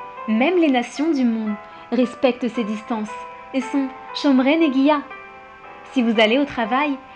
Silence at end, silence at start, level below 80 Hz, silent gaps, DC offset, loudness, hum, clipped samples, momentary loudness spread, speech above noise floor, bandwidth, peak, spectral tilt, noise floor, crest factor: 0 s; 0 s; -60 dBFS; none; under 0.1%; -20 LUFS; none; under 0.1%; 16 LU; 21 dB; 9 kHz; -4 dBFS; -5.5 dB/octave; -40 dBFS; 16 dB